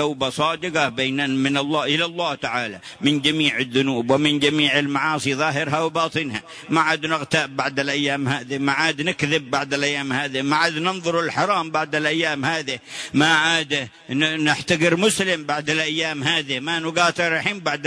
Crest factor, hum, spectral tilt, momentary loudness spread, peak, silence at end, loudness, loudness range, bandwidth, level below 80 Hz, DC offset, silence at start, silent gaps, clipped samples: 18 dB; none; -4 dB/octave; 6 LU; -4 dBFS; 0 s; -20 LUFS; 2 LU; 11 kHz; -60 dBFS; under 0.1%; 0 s; none; under 0.1%